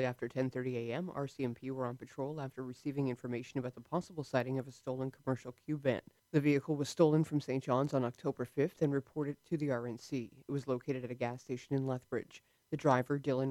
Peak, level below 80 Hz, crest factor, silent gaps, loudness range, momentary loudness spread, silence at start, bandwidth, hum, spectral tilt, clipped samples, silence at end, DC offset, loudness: -16 dBFS; -76 dBFS; 20 dB; none; 6 LU; 10 LU; 0 s; 14.5 kHz; none; -7.5 dB/octave; under 0.1%; 0 s; under 0.1%; -37 LUFS